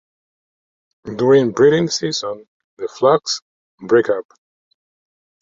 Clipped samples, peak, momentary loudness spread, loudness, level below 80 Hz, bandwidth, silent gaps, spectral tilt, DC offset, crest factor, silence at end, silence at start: under 0.1%; -2 dBFS; 18 LU; -17 LUFS; -60 dBFS; 7.8 kHz; 2.48-2.77 s, 3.42-3.78 s; -4.5 dB/octave; under 0.1%; 18 dB; 1.2 s; 1.05 s